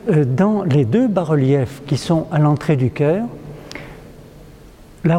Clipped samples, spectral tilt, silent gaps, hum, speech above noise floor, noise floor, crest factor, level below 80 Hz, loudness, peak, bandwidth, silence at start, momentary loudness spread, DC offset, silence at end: under 0.1%; -8 dB/octave; none; none; 26 dB; -42 dBFS; 14 dB; -46 dBFS; -17 LUFS; -2 dBFS; 11 kHz; 0.05 s; 18 LU; under 0.1%; 0 s